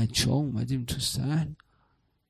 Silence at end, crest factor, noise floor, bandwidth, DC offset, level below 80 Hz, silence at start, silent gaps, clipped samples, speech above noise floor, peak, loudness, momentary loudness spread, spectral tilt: 0.75 s; 18 dB; -70 dBFS; 15.5 kHz; under 0.1%; -48 dBFS; 0 s; none; under 0.1%; 42 dB; -10 dBFS; -29 LUFS; 5 LU; -4.5 dB/octave